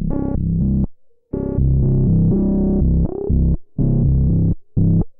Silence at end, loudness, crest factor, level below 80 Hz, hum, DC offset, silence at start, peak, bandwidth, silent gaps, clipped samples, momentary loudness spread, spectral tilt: 0.1 s; -18 LUFS; 10 dB; -22 dBFS; none; under 0.1%; 0 s; -6 dBFS; 1.8 kHz; none; under 0.1%; 6 LU; -17 dB/octave